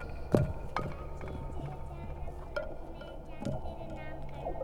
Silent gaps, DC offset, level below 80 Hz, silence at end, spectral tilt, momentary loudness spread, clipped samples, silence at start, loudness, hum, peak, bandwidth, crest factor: none; under 0.1%; -42 dBFS; 0 s; -8 dB/octave; 13 LU; under 0.1%; 0 s; -39 LUFS; none; -10 dBFS; 14.5 kHz; 28 dB